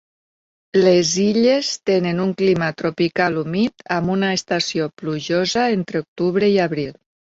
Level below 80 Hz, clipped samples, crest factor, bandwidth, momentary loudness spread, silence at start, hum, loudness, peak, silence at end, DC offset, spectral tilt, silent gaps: -56 dBFS; under 0.1%; 16 dB; 8 kHz; 7 LU; 0.75 s; none; -19 LUFS; -4 dBFS; 0.45 s; under 0.1%; -5 dB/octave; 6.08-6.16 s